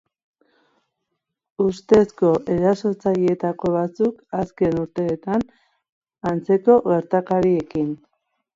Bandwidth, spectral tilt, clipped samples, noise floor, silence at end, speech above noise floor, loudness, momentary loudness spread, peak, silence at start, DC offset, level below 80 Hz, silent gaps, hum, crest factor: 7.8 kHz; -8.5 dB/octave; under 0.1%; -79 dBFS; 0.6 s; 59 dB; -20 LUFS; 10 LU; -2 dBFS; 1.6 s; under 0.1%; -54 dBFS; 5.89-6.01 s; none; 18 dB